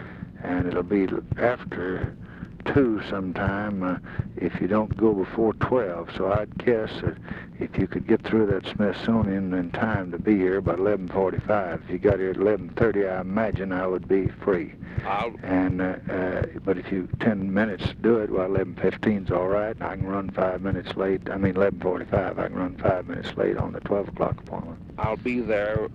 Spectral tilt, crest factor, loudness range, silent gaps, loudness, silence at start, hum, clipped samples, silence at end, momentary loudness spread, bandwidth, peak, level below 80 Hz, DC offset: -9 dB/octave; 18 dB; 3 LU; none; -26 LUFS; 0 s; none; under 0.1%; 0 s; 7 LU; 7.4 kHz; -6 dBFS; -44 dBFS; under 0.1%